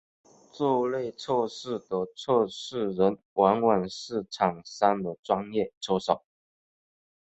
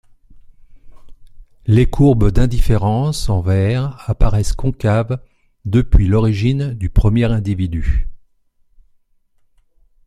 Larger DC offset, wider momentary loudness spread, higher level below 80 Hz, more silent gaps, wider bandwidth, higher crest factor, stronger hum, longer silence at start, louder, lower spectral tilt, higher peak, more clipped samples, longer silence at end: neither; about the same, 8 LU vs 9 LU; second, -66 dBFS vs -22 dBFS; first, 3.25-3.36 s, 5.19-5.23 s, 5.77-5.81 s vs none; second, 8.2 kHz vs 13 kHz; first, 22 dB vs 16 dB; neither; first, 0.55 s vs 0.35 s; second, -28 LUFS vs -17 LUFS; second, -5.5 dB/octave vs -7.5 dB/octave; second, -6 dBFS vs 0 dBFS; neither; second, 1.05 s vs 1.9 s